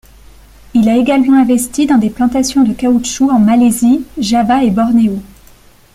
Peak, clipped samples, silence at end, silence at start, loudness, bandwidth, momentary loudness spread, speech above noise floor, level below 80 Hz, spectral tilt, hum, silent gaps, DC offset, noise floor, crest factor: -2 dBFS; under 0.1%; 0.7 s; 0.75 s; -11 LUFS; 15 kHz; 5 LU; 32 dB; -40 dBFS; -5 dB/octave; none; none; under 0.1%; -42 dBFS; 10 dB